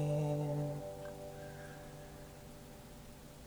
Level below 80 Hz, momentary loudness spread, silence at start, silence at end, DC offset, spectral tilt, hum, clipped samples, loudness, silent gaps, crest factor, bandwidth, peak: -60 dBFS; 17 LU; 0 s; 0 s; under 0.1%; -7 dB/octave; none; under 0.1%; -42 LUFS; none; 16 dB; over 20 kHz; -26 dBFS